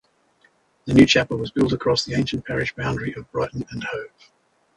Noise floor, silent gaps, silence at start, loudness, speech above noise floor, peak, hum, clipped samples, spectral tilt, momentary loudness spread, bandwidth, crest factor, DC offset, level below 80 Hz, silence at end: -61 dBFS; none; 0.85 s; -21 LUFS; 40 dB; -2 dBFS; none; under 0.1%; -5.5 dB/octave; 15 LU; 11.5 kHz; 22 dB; under 0.1%; -46 dBFS; 0.7 s